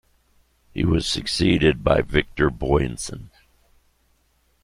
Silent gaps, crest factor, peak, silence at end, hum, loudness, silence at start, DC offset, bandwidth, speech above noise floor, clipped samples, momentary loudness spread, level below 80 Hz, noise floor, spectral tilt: none; 20 dB; -2 dBFS; 1.35 s; none; -21 LUFS; 0.75 s; under 0.1%; 15.5 kHz; 43 dB; under 0.1%; 14 LU; -36 dBFS; -64 dBFS; -5.5 dB/octave